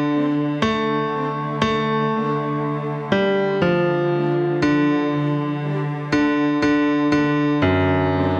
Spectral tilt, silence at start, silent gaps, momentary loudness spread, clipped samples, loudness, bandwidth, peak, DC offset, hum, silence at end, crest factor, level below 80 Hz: -7.5 dB/octave; 0 s; none; 5 LU; under 0.1%; -20 LUFS; 7.2 kHz; -4 dBFS; under 0.1%; none; 0 s; 16 dB; -52 dBFS